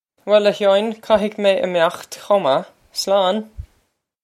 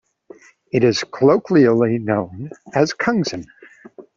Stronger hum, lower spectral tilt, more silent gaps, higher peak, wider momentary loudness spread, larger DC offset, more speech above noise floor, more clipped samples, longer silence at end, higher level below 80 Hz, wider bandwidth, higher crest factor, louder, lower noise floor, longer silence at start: neither; second, -4 dB/octave vs -6 dB/octave; neither; about the same, 0 dBFS vs -2 dBFS; about the same, 10 LU vs 12 LU; neither; first, 48 dB vs 28 dB; neither; first, 0.6 s vs 0.15 s; first, -50 dBFS vs -58 dBFS; first, 15 kHz vs 7.6 kHz; about the same, 18 dB vs 16 dB; about the same, -18 LUFS vs -18 LUFS; first, -66 dBFS vs -45 dBFS; second, 0.25 s vs 0.75 s